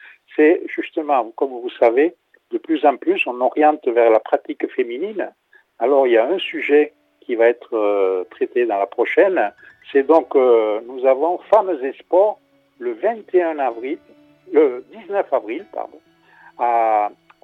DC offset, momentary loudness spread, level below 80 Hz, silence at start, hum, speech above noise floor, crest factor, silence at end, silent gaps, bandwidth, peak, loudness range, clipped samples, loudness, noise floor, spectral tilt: under 0.1%; 13 LU; -74 dBFS; 0.35 s; none; 32 dB; 18 dB; 0.35 s; none; 4.2 kHz; 0 dBFS; 4 LU; under 0.1%; -18 LUFS; -49 dBFS; -6 dB/octave